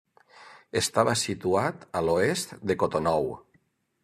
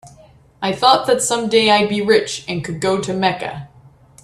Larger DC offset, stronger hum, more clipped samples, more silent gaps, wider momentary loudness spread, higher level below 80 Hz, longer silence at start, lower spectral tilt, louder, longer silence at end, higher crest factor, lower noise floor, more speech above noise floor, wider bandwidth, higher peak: neither; neither; neither; neither; second, 7 LU vs 12 LU; second, -60 dBFS vs -54 dBFS; first, 0.35 s vs 0.05 s; about the same, -4 dB/octave vs -3.5 dB/octave; second, -27 LUFS vs -16 LUFS; about the same, 0.65 s vs 0.55 s; about the same, 22 dB vs 18 dB; first, -68 dBFS vs -47 dBFS; first, 42 dB vs 31 dB; about the same, 13.5 kHz vs 13 kHz; second, -6 dBFS vs 0 dBFS